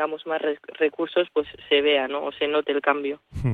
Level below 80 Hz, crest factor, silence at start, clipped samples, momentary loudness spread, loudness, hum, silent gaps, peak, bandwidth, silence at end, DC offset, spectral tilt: -50 dBFS; 18 dB; 0 s; under 0.1%; 8 LU; -24 LUFS; none; none; -6 dBFS; 4.5 kHz; 0 s; under 0.1%; -7.5 dB/octave